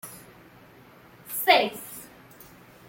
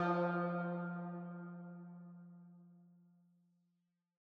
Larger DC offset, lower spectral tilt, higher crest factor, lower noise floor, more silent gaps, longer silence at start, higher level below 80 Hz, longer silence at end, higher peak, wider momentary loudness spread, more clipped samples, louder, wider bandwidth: neither; second, -2 dB/octave vs -7.5 dB/octave; first, 24 dB vs 18 dB; second, -52 dBFS vs -84 dBFS; neither; about the same, 0.05 s vs 0 s; first, -68 dBFS vs under -90 dBFS; second, 0.85 s vs 1.35 s; first, -6 dBFS vs -26 dBFS; first, 26 LU vs 23 LU; neither; first, -23 LUFS vs -42 LUFS; first, 17 kHz vs 5.4 kHz